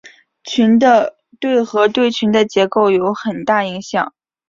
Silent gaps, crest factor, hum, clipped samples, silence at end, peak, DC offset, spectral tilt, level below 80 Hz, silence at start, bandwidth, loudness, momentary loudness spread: none; 14 dB; none; under 0.1%; 0.4 s; -2 dBFS; under 0.1%; -5 dB/octave; -58 dBFS; 0.05 s; 7.6 kHz; -15 LUFS; 10 LU